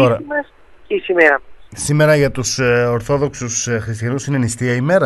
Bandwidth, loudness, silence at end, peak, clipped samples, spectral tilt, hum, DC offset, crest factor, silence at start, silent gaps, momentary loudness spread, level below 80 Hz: 12 kHz; -16 LUFS; 0 s; 0 dBFS; under 0.1%; -5 dB/octave; none; under 0.1%; 16 dB; 0 s; none; 11 LU; -44 dBFS